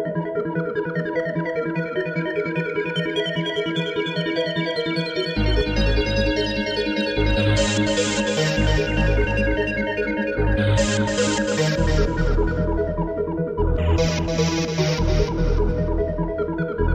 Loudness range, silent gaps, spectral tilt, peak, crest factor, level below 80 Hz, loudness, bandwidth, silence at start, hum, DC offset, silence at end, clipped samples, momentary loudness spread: 3 LU; none; -5 dB/octave; -6 dBFS; 14 dB; -28 dBFS; -22 LUFS; 9.8 kHz; 0 s; none; under 0.1%; 0 s; under 0.1%; 5 LU